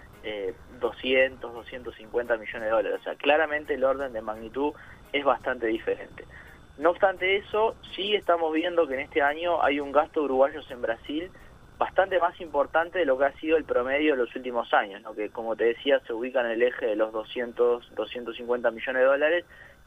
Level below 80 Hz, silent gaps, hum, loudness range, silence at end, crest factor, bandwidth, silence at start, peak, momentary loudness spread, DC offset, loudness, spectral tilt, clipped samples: -56 dBFS; none; none; 2 LU; 0.2 s; 20 dB; 8.4 kHz; 0 s; -6 dBFS; 11 LU; under 0.1%; -27 LUFS; -5.5 dB/octave; under 0.1%